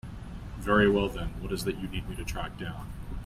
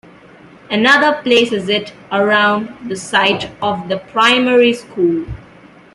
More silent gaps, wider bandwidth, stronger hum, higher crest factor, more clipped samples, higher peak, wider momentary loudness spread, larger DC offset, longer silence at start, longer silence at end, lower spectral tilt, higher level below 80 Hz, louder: neither; first, 16 kHz vs 12 kHz; neither; first, 20 dB vs 14 dB; neither; second, -10 dBFS vs 0 dBFS; first, 18 LU vs 11 LU; neither; second, 0.05 s vs 0.7 s; second, 0 s vs 0.55 s; first, -6 dB/octave vs -4 dB/octave; first, -40 dBFS vs -46 dBFS; second, -30 LUFS vs -14 LUFS